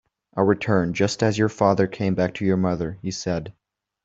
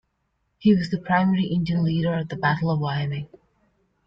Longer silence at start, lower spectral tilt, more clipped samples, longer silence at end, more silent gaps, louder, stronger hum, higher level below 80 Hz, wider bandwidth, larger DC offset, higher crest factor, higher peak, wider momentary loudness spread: second, 0.35 s vs 0.6 s; second, -6 dB/octave vs -8.5 dB/octave; neither; second, 0.55 s vs 0.8 s; neither; about the same, -22 LUFS vs -23 LUFS; neither; about the same, -54 dBFS vs -54 dBFS; about the same, 7.8 kHz vs 7.2 kHz; neither; about the same, 18 dB vs 16 dB; first, -4 dBFS vs -8 dBFS; about the same, 9 LU vs 7 LU